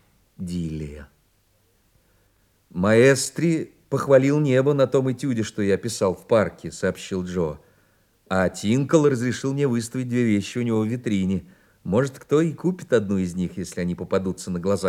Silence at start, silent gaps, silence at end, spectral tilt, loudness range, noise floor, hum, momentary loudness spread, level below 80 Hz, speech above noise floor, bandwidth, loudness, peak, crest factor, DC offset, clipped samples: 0.4 s; none; 0 s; -6 dB/octave; 5 LU; -63 dBFS; none; 11 LU; -56 dBFS; 42 dB; 16 kHz; -23 LUFS; -2 dBFS; 20 dB; under 0.1%; under 0.1%